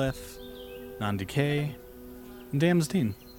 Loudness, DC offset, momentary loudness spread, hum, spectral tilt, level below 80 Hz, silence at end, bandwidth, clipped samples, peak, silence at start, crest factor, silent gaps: -29 LUFS; under 0.1%; 20 LU; none; -6.5 dB/octave; -52 dBFS; 0 s; 18 kHz; under 0.1%; -12 dBFS; 0 s; 18 dB; none